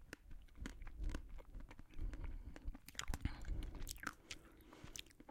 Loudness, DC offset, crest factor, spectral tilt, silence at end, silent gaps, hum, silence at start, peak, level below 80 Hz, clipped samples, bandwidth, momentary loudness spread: -52 LUFS; under 0.1%; 26 dB; -4 dB/octave; 0 s; none; none; 0 s; -24 dBFS; -50 dBFS; under 0.1%; 16.5 kHz; 11 LU